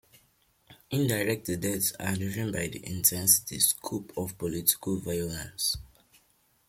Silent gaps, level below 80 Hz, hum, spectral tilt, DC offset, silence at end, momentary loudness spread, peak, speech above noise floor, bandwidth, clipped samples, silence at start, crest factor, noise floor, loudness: none; -56 dBFS; none; -3 dB/octave; under 0.1%; 0.8 s; 12 LU; -6 dBFS; 38 dB; 16.5 kHz; under 0.1%; 0.7 s; 24 dB; -68 dBFS; -28 LUFS